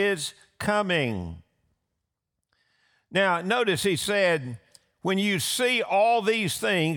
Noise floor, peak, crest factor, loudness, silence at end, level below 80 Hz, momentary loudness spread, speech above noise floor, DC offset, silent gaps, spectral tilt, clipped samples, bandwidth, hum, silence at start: -83 dBFS; -12 dBFS; 16 dB; -25 LUFS; 0 s; -62 dBFS; 12 LU; 58 dB; under 0.1%; none; -4 dB/octave; under 0.1%; over 20 kHz; none; 0 s